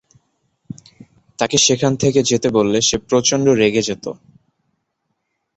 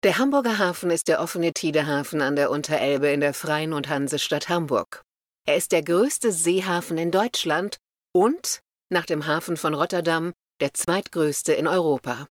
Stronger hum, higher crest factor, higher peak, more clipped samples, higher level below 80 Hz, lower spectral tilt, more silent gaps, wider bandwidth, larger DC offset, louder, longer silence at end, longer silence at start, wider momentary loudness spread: neither; about the same, 18 dB vs 16 dB; first, 0 dBFS vs -6 dBFS; neither; first, -50 dBFS vs -68 dBFS; about the same, -3.5 dB/octave vs -4 dB/octave; neither; second, 8.2 kHz vs 18.5 kHz; neither; first, -16 LUFS vs -23 LUFS; first, 1.4 s vs 0.05 s; first, 1.4 s vs 0.05 s; first, 23 LU vs 6 LU